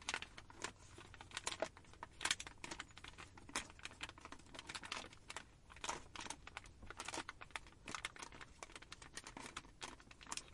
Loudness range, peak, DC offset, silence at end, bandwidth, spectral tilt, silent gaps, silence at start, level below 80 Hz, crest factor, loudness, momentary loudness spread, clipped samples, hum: 4 LU; -18 dBFS; under 0.1%; 0 s; 11.5 kHz; -1.5 dB/octave; none; 0 s; -66 dBFS; 32 dB; -49 LUFS; 11 LU; under 0.1%; none